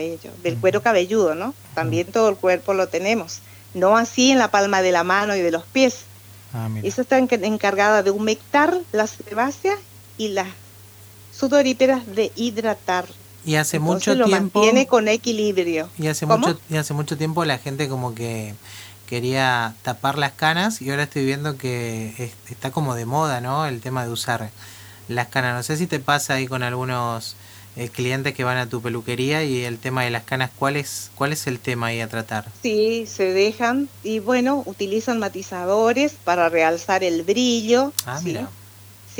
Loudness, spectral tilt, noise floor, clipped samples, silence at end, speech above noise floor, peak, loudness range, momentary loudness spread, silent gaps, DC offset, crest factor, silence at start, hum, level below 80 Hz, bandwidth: -21 LUFS; -4.5 dB/octave; -44 dBFS; under 0.1%; 0 s; 24 dB; 0 dBFS; 6 LU; 12 LU; none; under 0.1%; 20 dB; 0 s; none; -64 dBFS; over 20 kHz